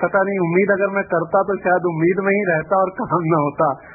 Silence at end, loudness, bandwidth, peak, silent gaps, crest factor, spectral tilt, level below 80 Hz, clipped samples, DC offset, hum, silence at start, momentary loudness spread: 0 s; -18 LUFS; 2.6 kHz; -4 dBFS; none; 14 dB; -16 dB/octave; -56 dBFS; under 0.1%; under 0.1%; none; 0 s; 3 LU